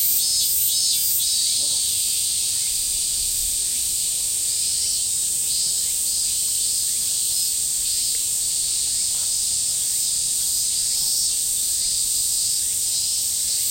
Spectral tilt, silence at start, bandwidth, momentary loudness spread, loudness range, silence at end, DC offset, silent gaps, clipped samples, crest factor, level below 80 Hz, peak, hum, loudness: 2 dB/octave; 0 s; 16.5 kHz; 3 LU; 1 LU; 0 s; under 0.1%; none; under 0.1%; 16 dB; -50 dBFS; -6 dBFS; none; -19 LUFS